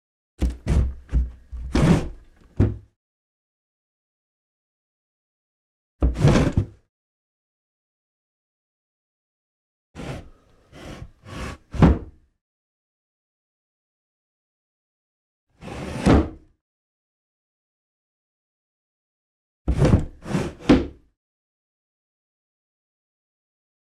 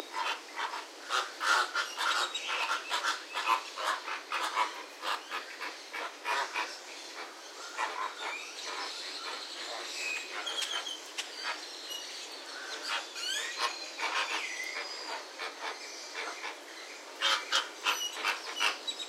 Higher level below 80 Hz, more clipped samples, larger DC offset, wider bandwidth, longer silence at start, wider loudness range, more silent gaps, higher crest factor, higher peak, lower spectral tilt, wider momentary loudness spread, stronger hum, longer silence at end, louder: first, -32 dBFS vs under -90 dBFS; neither; neither; second, 11.5 kHz vs 16 kHz; first, 0.4 s vs 0 s; first, 17 LU vs 6 LU; first, 2.96-5.99 s, 6.89-9.94 s, 12.41-15.47 s, 16.61-19.65 s vs none; about the same, 22 dB vs 24 dB; first, -4 dBFS vs -12 dBFS; first, -7.5 dB/octave vs 3.5 dB/octave; first, 20 LU vs 11 LU; neither; first, 2.9 s vs 0 s; first, -22 LUFS vs -34 LUFS